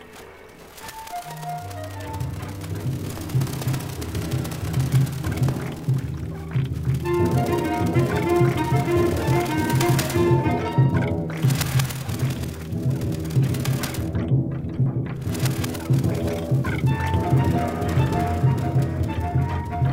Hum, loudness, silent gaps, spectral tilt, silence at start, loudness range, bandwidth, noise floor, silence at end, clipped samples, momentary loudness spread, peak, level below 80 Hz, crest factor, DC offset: none; -23 LUFS; none; -6.5 dB/octave; 0 s; 7 LU; 16.5 kHz; -44 dBFS; 0 s; under 0.1%; 11 LU; -6 dBFS; -38 dBFS; 16 dB; under 0.1%